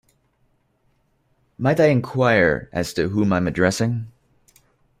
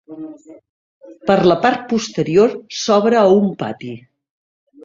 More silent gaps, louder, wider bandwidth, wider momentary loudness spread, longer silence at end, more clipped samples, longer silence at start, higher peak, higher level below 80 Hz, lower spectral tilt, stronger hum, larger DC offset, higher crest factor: second, none vs 0.69-1.01 s; second, -20 LUFS vs -15 LUFS; first, 15.5 kHz vs 7.6 kHz; second, 8 LU vs 21 LU; about the same, 0.9 s vs 0.85 s; neither; first, 1.6 s vs 0.1 s; second, -4 dBFS vs 0 dBFS; first, -50 dBFS vs -56 dBFS; about the same, -6 dB/octave vs -5.5 dB/octave; neither; neither; about the same, 18 dB vs 18 dB